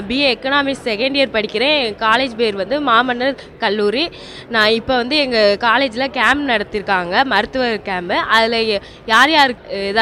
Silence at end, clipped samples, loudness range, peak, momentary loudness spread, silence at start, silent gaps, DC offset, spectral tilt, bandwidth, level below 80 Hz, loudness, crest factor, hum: 0 s; under 0.1%; 1 LU; 0 dBFS; 7 LU; 0 s; none; under 0.1%; -3.5 dB/octave; 16 kHz; -46 dBFS; -15 LUFS; 16 dB; none